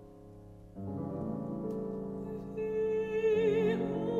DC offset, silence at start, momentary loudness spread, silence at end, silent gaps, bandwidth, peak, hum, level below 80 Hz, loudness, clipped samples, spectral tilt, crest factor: under 0.1%; 0 s; 23 LU; 0 s; none; 7.4 kHz; -18 dBFS; none; -58 dBFS; -34 LUFS; under 0.1%; -8.5 dB/octave; 14 dB